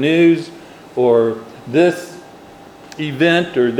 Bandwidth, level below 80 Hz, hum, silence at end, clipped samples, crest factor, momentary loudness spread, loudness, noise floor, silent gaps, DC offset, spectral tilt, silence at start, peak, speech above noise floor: 12 kHz; -60 dBFS; none; 0 s; under 0.1%; 16 dB; 17 LU; -15 LUFS; -39 dBFS; none; under 0.1%; -6.5 dB/octave; 0 s; 0 dBFS; 25 dB